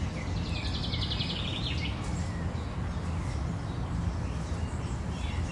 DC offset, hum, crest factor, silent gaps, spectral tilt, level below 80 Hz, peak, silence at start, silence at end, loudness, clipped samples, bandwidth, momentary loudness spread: under 0.1%; none; 14 dB; none; -5.5 dB/octave; -38 dBFS; -18 dBFS; 0 s; 0 s; -33 LUFS; under 0.1%; 11.5 kHz; 4 LU